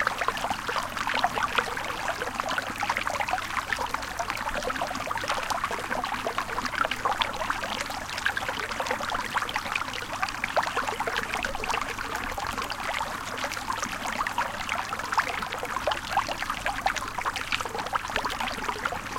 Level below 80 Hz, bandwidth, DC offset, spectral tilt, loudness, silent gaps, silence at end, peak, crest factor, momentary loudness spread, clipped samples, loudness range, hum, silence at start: -48 dBFS; 17 kHz; under 0.1%; -2 dB/octave; -29 LUFS; none; 0 s; -4 dBFS; 26 dB; 4 LU; under 0.1%; 1 LU; none; 0 s